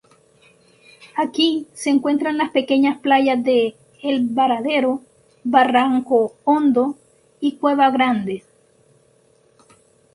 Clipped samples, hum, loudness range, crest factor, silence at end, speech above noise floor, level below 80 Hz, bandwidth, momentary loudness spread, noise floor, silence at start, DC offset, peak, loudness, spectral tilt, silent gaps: under 0.1%; none; 3 LU; 18 dB; 1.75 s; 39 dB; -66 dBFS; 11.5 kHz; 9 LU; -57 dBFS; 1.15 s; under 0.1%; 0 dBFS; -19 LUFS; -4.5 dB/octave; none